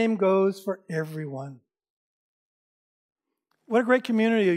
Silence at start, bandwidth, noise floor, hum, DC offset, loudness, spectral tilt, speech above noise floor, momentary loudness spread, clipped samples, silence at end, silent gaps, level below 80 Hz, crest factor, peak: 0 s; 15 kHz; -77 dBFS; none; under 0.1%; -25 LUFS; -7 dB/octave; 53 dB; 14 LU; under 0.1%; 0 s; 1.90-3.16 s; -88 dBFS; 18 dB; -8 dBFS